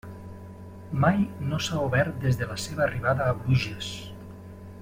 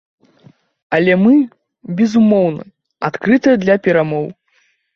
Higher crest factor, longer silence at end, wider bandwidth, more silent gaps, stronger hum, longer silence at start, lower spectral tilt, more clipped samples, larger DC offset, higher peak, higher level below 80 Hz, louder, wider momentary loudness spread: first, 20 dB vs 14 dB; second, 0 s vs 0.65 s; first, 16 kHz vs 7 kHz; neither; neither; second, 0.05 s vs 0.9 s; second, -6 dB/octave vs -7.5 dB/octave; neither; neither; second, -8 dBFS vs -2 dBFS; first, -50 dBFS vs -56 dBFS; second, -26 LUFS vs -14 LUFS; first, 20 LU vs 12 LU